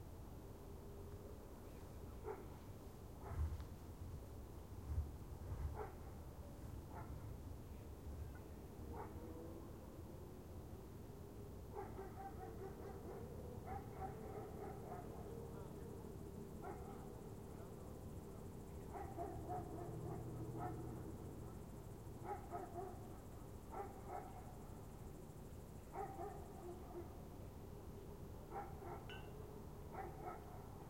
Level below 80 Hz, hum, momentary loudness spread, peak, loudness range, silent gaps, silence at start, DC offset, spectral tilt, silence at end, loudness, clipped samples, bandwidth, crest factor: -58 dBFS; none; 7 LU; -32 dBFS; 4 LU; none; 0 s; under 0.1%; -7 dB/octave; 0 s; -53 LUFS; under 0.1%; 16.5 kHz; 18 dB